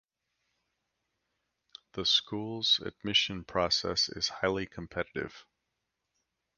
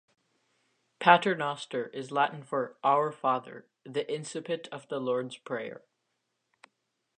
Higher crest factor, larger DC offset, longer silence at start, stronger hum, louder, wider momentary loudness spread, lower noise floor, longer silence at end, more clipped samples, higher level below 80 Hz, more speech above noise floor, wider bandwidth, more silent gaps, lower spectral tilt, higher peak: about the same, 22 dB vs 24 dB; neither; first, 1.95 s vs 1 s; neither; about the same, -30 LUFS vs -30 LUFS; second, 11 LU vs 14 LU; first, -84 dBFS vs -80 dBFS; second, 1.15 s vs 1.4 s; neither; first, -60 dBFS vs -86 dBFS; about the same, 52 dB vs 51 dB; about the same, 10 kHz vs 9.6 kHz; neither; second, -3 dB/octave vs -4.5 dB/octave; second, -12 dBFS vs -6 dBFS